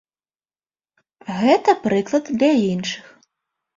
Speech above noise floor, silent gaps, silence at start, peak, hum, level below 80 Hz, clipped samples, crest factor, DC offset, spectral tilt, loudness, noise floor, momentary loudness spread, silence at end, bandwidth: over 72 dB; none; 1.25 s; -2 dBFS; none; -62 dBFS; under 0.1%; 18 dB; under 0.1%; -5.5 dB/octave; -19 LUFS; under -90 dBFS; 14 LU; 0.75 s; 7.8 kHz